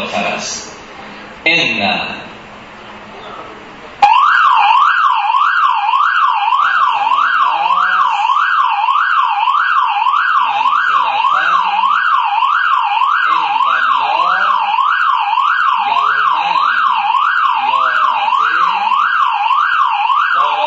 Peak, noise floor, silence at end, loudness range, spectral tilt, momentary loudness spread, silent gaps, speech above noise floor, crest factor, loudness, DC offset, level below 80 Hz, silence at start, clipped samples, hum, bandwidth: 0 dBFS; -33 dBFS; 0 s; 3 LU; -1.5 dB/octave; 13 LU; none; 17 dB; 14 dB; -12 LUFS; under 0.1%; -58 dBFS; 0 s; under 0.1%; none; 8 kHz